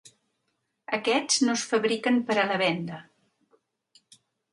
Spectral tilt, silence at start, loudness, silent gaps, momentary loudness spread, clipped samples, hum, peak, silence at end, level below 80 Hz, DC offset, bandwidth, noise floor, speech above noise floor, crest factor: -3 dB/octave; 0.05 s; -25 LUFS; none; 10 LU; under 0.1%; none; -8 dBFS; 1.5 s; -76 dBFS; under 0.1%; 11.5 kHz; -78 dBFS; 52 dB; 20 dB